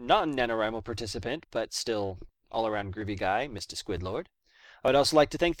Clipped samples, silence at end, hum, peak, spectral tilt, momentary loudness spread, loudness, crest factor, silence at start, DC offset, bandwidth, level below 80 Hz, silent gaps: under 0.1%; 0.05 s; none; -8 dBFS; -4 dB/octave; 12 LU; -29 LUFS; 20 dB; 0 s; under 0.1%; 17 kHz; -50 dBFS; none